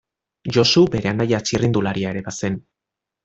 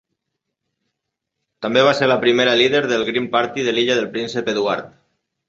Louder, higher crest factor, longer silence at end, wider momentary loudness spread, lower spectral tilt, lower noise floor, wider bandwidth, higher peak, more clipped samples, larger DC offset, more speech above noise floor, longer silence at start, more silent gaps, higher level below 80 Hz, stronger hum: about the same, -19 LUFS vs -17 LUFS; about the same, 18 dB vs 18 dB; about the same, 0.65 s vs 0.6 s; first, 11 LU vs 8 LU; about the same, -5 dB/octave vs -4 dB/octave; first, -85 dBFS vs -79 dBFS; about the same, 8 kHz vs 7.8 kHz; second, -4 dBFS vs 0 dBFS; neither; neither; first, 66 dB vs 62 dB; second, 0.45 s vs 1.6 s; neither; first, -50 dBFS vs -62 dBFS; neither